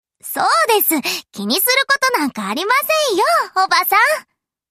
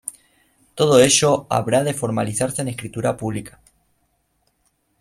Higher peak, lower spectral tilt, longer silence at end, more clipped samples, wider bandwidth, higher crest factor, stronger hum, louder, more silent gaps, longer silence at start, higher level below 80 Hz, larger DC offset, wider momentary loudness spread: about the same, 0 dBFS vs -2 dBFS; second, -1.5 dB/octave vs -4 dB/octave; second, 0.5 s vs 1.5 s; neither; about the same, 15 kHz vs 16 kHz; about the same, 16 dB vs 20 dB; neither; first, -15 LUFS vs -19 LUFS; neither; first, 0.25 s vs 0.05 s; second, -66 dBFS vs -54 dBFS; neither; second, 8 LU vs 15 LU